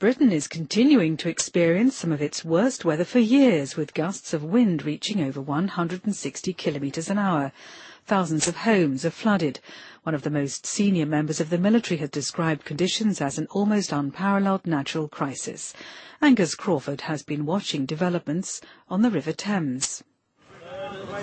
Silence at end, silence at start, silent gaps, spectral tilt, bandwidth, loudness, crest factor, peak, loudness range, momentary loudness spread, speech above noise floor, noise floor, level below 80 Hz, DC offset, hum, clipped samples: 0 s; 0 s; none; -5 dB/octave; 8.8 kHz; -24 LUFS; 16 dB; -8 dBFS; 4 LU; 11 LU; 29 dB; -53 dBFS; -66 dBFS; under 0.1%; none; under 0.1%